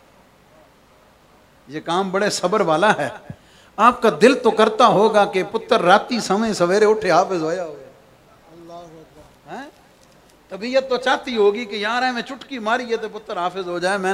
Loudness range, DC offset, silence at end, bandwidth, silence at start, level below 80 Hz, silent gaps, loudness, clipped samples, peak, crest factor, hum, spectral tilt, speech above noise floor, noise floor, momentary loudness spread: 10 LU; under 0.1%; 0 s; 14 kHz; 1.7 s; -60 dBFS; none; -18 LUFS; under 0.1%; 0 dBFS; 20 dB; none; -4.5 dB/octave; 34 dB; -52 dBFS; 20 LU